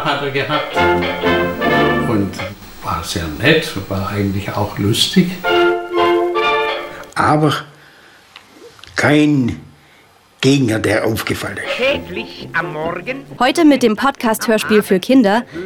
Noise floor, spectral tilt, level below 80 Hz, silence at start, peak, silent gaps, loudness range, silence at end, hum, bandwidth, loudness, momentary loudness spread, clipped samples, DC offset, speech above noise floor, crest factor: -48 dBFS; -5 dB/octave; -44 dBFS; 0 s; 0 dBFS; none; 3 LU; 0 s; none; 17 kHz; -16 LUFS; 10 LU; under 0.1%; under 0.1%; 33 dB; 16 dB